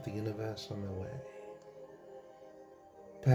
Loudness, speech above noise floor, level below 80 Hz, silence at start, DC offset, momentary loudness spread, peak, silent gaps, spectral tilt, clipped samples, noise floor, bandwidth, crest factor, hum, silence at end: -43 LUFS; 16 dB; -68 dBFS; 0 s; under 0.1%; 16 LU; -14 dBFS; none; -7.5 dB/octave; under 0.1%; -56 dBFS; 11 kHz; 24 dB; none; 0 s